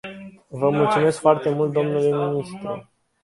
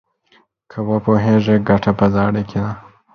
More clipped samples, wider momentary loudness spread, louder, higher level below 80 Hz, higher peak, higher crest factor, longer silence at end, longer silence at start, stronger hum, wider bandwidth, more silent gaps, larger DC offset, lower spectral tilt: neither; first, 17 LU vs 12 LU; second, -21 LUFS vs -16 LUFS; second, -62 dBFS vs -42 dBFS; about the same, -2 dBFS vs 0 dBFS; about the same, 20 dB vs 16 dB; about the same, 0.4 s vs 0.35 s; second, 0.05 s vs 0.75 s; neither; first, 11.5 kHz vs 6.4 kHz; neither; neither; second, -7 dB/octave vs -9 dB/octave